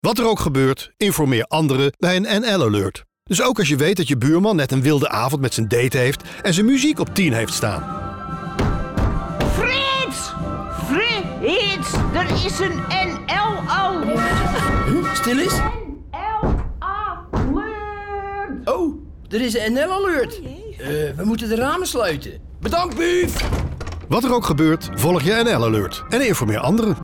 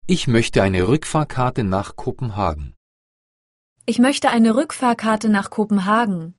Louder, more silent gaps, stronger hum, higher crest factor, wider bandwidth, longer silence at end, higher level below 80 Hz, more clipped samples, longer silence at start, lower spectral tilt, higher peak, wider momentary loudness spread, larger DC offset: about the same, -20 LUFS vs -19 LUFS; second, none vs 2.77-3.76 s; neither; second, 10 dB vs 18 dB; first, 18 kHz vs 11.5 kHz; about the same, 0 s vs 0.05 s; first, -32 dBFS vs -40 dBFS; neither; about the same, 0.05 s vs 0.05 s; about the same, -5 dB/octave vs -5.5 dB/octave; second, -8 dBFS vs 0 dBFS; about the same, 10 LU vs 10 LU; neither